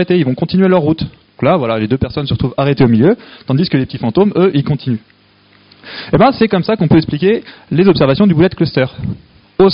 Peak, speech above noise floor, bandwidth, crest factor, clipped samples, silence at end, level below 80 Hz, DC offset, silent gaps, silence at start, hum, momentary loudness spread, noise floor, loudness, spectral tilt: 0 dBFS; 36 dB; 5.6 kHz; 12 dB; under 0.1%; 0 s; -40 dBFS; under 0.1%; none; 0 s; none; 10 LU; -48 dBFS; -13 LUFS; -6.5 dB/octave